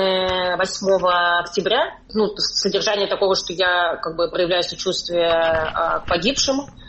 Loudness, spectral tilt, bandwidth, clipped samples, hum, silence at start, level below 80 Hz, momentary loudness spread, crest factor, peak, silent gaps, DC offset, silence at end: -19 LUFS; -3 dB/octave; 8.4 kHz; under 0.1%; none; 0 s; -46 dBFS; 5 LU; 16 dB; -4 dBFS; none; under 0.1%; 0 s